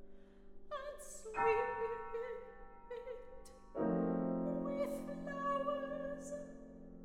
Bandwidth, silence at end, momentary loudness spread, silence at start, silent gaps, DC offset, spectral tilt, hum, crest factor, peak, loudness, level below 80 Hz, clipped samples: 16 kHz; 0 s; 17 LU; 0 s; none; under 0.1%; -6.5 dB/octave; none; 18 dB; -22 dBFS; -41 LUFS; -62 dBFS; under 0.1%